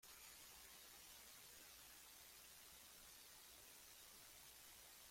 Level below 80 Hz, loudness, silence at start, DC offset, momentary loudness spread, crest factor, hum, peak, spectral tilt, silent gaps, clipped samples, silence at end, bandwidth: -80 dBFS; -61 LUFS; 0 s; under 0.1%; 1 LU; 14 dB; none; -50 dBFS; 0 dB/octave; none; under 0.1%; 0 s; 16.5 kHz